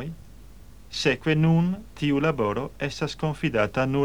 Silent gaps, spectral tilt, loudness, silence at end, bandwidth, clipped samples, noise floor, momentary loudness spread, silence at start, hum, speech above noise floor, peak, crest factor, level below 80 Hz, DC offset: none; -6.5 dB/octave; -25 LUFS; 0 s; 11 kHz; under 0.1%; -47 dBFS; 10 LU; 0 s; none; 23 dB; -8 dBFS; 16 dB; -48 dBFS; 0.4%